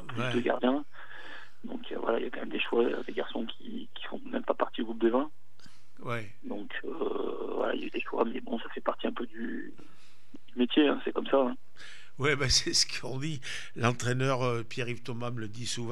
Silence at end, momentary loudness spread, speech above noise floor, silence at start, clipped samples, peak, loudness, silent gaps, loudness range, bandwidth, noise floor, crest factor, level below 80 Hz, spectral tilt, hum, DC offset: 0 s; 16 LU; 29 dB; 0 s; under 0.1%; -12 dBFS; -31 LUFS; none; 6 LU; 13.5 kHz; -60 dBFS; 20 dB; -56 dBFS; -4 dB/octave; none; 2%